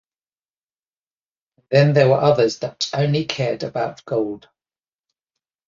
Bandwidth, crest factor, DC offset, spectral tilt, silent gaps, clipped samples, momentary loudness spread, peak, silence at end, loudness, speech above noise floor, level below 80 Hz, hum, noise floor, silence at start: 7.4 kHz; 20 dB; under 0.1%; -6 dB/octave; none; under 0.1%; 11 LU; -2 dBFS; 1.3 s; -19 LUFS; over 72 dB; -60 dBFS; none; under -90 dBFS; 1.7 s